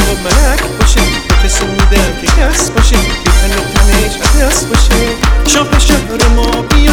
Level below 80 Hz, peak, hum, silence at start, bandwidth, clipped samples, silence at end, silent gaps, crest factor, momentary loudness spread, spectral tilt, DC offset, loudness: -10 dBFS; 0 dBFS; none; 0 s; 18 kHz; 1%; 0 s; none; 8 dB; 2 LU; -4 dB/octave; under 0.1%; -10 LUFS